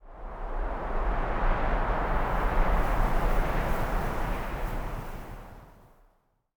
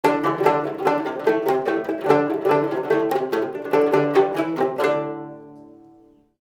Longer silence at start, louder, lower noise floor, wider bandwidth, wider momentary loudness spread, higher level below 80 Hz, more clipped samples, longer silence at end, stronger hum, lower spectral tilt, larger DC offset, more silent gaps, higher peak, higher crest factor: about the same, 0.05 s vs 0.05 s; second, -31 LUFS vs -21 LUFS; first, -67 dBFS vs -53 dBFS; first, over 20 kHz vs 17 kHz; first, 14 LU vs 6 LU; first, -30 dBFS vs -70 dBFS; neither; about the same, 0.85 s vs 0.9 s; neither; about the same, -6.5 dB/octave vs -6.5 dB/octave; neither; neither; second, -12 dBFS vs -2 dBFS; about the same, 16 dB vs 20 dB